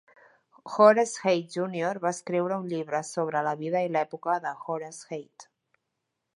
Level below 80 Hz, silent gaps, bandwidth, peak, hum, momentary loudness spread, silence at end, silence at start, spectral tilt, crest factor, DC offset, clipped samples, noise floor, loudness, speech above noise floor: -82 dBFS; none; 11.5 kHz; -4 dBFS; none; 15 LU; 0.95 s; 0.65 s; -5 dB/octave; 24 dB; under 0.1%; under 0.1%; -82 dBFS; -27 LUFS; 55 dB